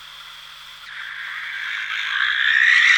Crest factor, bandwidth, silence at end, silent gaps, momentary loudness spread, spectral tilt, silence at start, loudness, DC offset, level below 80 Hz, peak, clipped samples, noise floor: 18 dB; 19 kHz; 0 s; none; 23 LU; 3.5 dB/octave; 0 s; -19 LUFS; under 0.1%; -64 dBFS; -2 dBFS; under 0.1%; -40 dBFS